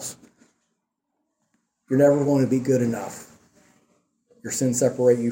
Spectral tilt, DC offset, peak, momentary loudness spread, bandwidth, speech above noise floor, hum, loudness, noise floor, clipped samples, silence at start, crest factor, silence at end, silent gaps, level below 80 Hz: -6 dB/octave; under 0.1%; -6 dBFS; 18 LU; 16.5 kHz; 57 dB; none; -21 LUFS; -78 dBFS; under 0.1%; 0 s; 18 dB; 0 s; none; -66 dBFS